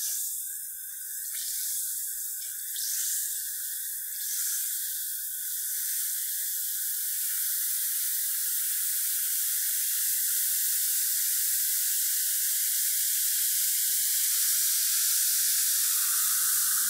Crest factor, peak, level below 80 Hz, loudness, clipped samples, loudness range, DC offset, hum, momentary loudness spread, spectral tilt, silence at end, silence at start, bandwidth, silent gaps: 16 dB; -14 dBFS; -78 dBFS; -25 LUFS; under 0.1%; 6 LU; under 0.1%; none; 8 LU; 6 dB/octave; 0 s; 0 s; 16 kHz; none